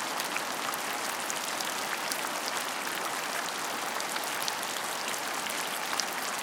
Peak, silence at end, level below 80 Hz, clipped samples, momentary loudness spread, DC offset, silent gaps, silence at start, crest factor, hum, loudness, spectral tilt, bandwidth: -8 dBFS; 0 s; -84 dBFS; under 0.1%; 1 LU; under 0.1%; none; 0 s; 26 dB; none; -31 LUFS; 0 dB/octave; 19 kHz